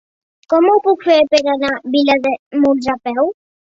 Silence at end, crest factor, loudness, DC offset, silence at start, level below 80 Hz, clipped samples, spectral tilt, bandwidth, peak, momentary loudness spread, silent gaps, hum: 0.45 s; 14 dB; -15 LUFS; under 0.1%; 0.5 s; -56 dBFS; under 0.1%; -4 dB/octave; 7.8 kHz; 0 dBFS; 7 LU; 2.39-2.51 s; none